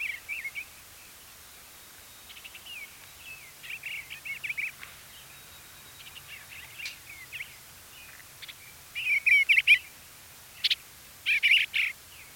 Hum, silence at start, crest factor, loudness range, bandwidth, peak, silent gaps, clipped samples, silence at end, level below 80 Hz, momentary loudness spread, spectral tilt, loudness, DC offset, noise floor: none; 0 s; 22 dB; 19 LU; 17 kHz; -10 dBFS; none; under 0.1%; 0 s; -66 dBFS; 26 LU; 1 dB/octave; -25 LUFS; under 0.1%; -50 dBFS